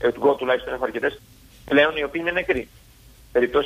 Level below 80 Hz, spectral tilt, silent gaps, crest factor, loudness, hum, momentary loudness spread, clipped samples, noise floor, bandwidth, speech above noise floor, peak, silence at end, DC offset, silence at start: -48 dBFS; -5.5 dB/octave; none; 18 dB; -22 LUFS; none; 9 LU; under 0.1%; -49 dBFS; 15.5 kHz; 28 dB; -4 dBFS; 0 s; under 0.1%; 0 s